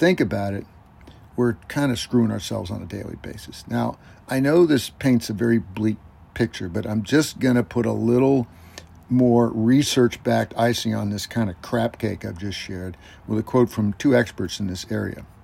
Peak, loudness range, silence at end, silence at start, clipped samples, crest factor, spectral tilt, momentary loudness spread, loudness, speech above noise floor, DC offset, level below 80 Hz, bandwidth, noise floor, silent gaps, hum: -6 dBFS; 5 LU; 0.15 s; 0 s; under 0.1%; 16 dB; -6 dB/octave; 15 LU; -22 LUFS; 25 dB; under 0.1%; -50 dBFS; 16 kHz; -47 dBFS; none; none